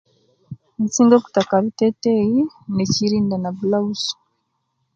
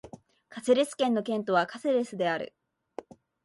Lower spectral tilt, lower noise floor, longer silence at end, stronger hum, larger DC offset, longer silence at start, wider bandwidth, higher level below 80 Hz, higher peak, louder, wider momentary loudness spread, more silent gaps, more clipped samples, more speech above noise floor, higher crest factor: about the same, -5.5 dB/octave vs -4.5 dB/octave; first, -71 dBFS vs -50 dBFS; first, 0.8 s vs 0.45 s; neither; neither; first, 0.5 s vs 0.05 s; second, 7.8 kHz vs 11.5 kHz; first, -58 dBFS vs -72 dBFS; first, 0 dBFS vs -10 dBFS; first, -19 LUFS vs -28 LUFS; second, 11 LU vs 20 LU; neither; neither; first, 53 dB vs 23 dB; about the same, 20 dB vs 18 dB